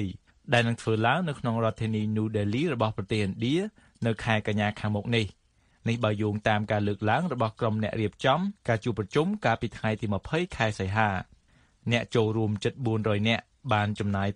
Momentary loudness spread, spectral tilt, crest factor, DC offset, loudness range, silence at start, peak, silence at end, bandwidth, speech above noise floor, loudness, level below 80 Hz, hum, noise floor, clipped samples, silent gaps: 5 LU; -6.5 dB/octave; 22 dB; under 0.1%; 1 LU; 0 s; -6 dBFS; 0 s; 10.5 kHz; 35 dB; -28 LUFS; -54 dBFS; none; -62 dBFS; under 0.1%; none